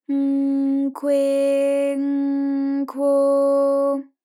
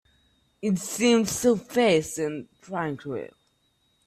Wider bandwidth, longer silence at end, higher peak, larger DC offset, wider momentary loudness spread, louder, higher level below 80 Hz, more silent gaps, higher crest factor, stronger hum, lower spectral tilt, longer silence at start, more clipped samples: second, 12 kHz vs 16 kHz; second, 0.2 s vs 0.8 s; about the same, -12 dBFS vs -10 dBFS; neither; second, 5 LU vs 14 LU; first, -20 LUFS vs -25 LUFS; second, under -90 dBFS vs -60 dBFS; neither; second, 8 dB vs 16 dB; neither; about the same, -5 dB/octave vs -4.5 dB/octave; second, 0.1 s vs 0.6 s; neither